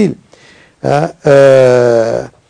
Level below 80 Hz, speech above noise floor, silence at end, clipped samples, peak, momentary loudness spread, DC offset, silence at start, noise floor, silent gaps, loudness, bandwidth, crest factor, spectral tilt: -48 dBFS; 34 dB; 0.25 s; 4%; 0 dBFS; 10 LU; under 0.1%; 0 s; -42 dBFS; none; -9 LUFS; 11 kHz; 10 dB; -6.5 dB/octave